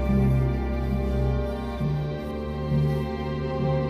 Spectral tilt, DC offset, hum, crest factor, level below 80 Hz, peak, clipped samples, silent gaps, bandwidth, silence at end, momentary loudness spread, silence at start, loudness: -9 dB/octave; under 0.1%; none; 12 dB; -30 dBFS; -12 dBFS; under 0.1%; none; 11 kHz; 0 s; 8 LU; 0 s; -27 LUFS